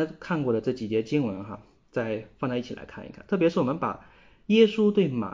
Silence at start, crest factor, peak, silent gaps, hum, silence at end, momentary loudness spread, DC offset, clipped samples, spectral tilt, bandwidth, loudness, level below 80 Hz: 0 s; 20 dB; -6 dBFS; none; none; 0 s; 21 LU; under 0.1%; under 0.1%; -7.5 dB/octave; 7.6 kHz; -26 LUFS; -60 dBFS